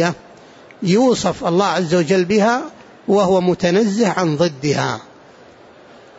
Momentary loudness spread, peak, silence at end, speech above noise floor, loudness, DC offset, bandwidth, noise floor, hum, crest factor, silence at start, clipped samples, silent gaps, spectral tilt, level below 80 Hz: 10 LU; -4 dBFS; 1.15 s; 28 dB; -17 LUFS; under 0.1%; 8 kHz; -44 dBFS; none; 14 dB; 0 s; under 0.1%; none; -5.5 dB/octave; -54 dBFS